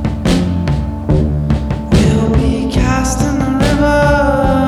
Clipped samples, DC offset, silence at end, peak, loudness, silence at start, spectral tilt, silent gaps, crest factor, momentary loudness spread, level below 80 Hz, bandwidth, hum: under 0.1%; under 0.1%; 0 s; 0 dBFS; -13 LUFS; 0 s; -6.5 dB/octave; none; 12 dB; 5 LU; -20 dBFS; 13.5 kHz; none